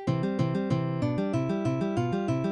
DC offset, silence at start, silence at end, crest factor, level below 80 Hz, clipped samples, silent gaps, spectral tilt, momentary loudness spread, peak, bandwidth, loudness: under 0.1%; 0 s; 0 s; 12 dB; -56 dBFS; under 0.1%; none; -8 dB/octave; 1 LU; -16 dBFS; 9 kHz; -28 LUFS